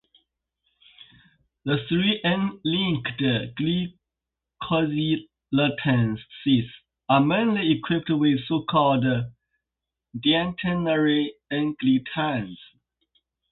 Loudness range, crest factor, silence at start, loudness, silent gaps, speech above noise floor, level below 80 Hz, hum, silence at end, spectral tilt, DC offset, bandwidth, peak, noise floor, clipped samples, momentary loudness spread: 3 LU; 20 dB; 1.65 s; -24 LUFS; none; 64 dB; -56 dBFS; none; 0.95 s; -11 dB/octave; under 0.1%; 4.3 kHz; -6 dBFS; -87 dBFS; under 0.1%; 8 LU